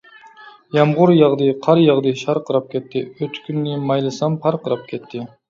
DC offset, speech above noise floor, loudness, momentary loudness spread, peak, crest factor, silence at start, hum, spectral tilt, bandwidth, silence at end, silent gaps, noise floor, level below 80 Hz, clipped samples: under 0.1%; 26 dB; -18 LUFS; 14 LU; 0 dBFS; 18 dB; 0.4 s; none; -7.5 dB/octave; 7.6 kHz; 0.25 s; none; -43 dBFS; -64 dBFS; under 0.1%